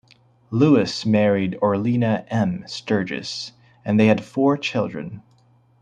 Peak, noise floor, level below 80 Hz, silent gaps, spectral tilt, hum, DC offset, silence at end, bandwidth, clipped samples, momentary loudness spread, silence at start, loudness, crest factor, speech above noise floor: -2 dBFS; -57 dBFS; -60 dBFS; none; -6.5 dB/octave; none; under 0.1%; 0.6 s; 9.6 kHz; under 0.1%; 13 LU; 0.5 s; -21 LUFS; 18 dB; 37 dB